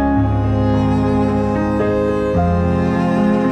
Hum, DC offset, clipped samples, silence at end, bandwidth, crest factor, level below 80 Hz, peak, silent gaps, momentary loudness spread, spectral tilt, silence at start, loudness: none; under 0.1%; under 0.1%; 0 s; 8.8 kHz; 10 dB; -28 dBFS; -4 dBFS; none; 2 LU; -9 dB/octave; 0 s; -16 LUFS